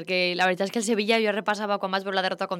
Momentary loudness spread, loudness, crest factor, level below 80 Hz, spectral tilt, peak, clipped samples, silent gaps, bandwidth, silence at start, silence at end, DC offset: 4 LU; -25 LUFS; 16 dB; -76 dBFS; -3.5 dB/octave; -10 dBFS; under 0.1%; none; 16.5 kHz; 0 s; 0 s; under 0.1%